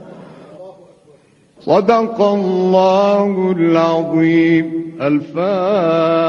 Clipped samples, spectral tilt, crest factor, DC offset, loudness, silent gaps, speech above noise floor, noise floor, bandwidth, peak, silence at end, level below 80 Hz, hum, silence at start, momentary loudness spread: under 0.1%; -7.5 dB/octave; 14 dB; under 0.1%; -14 LUFS; none; 36 dB; -49 dBFS; 7 kHz; 0 dBFS; 0 s; -58 dBFS; none; 0 s; 6 LU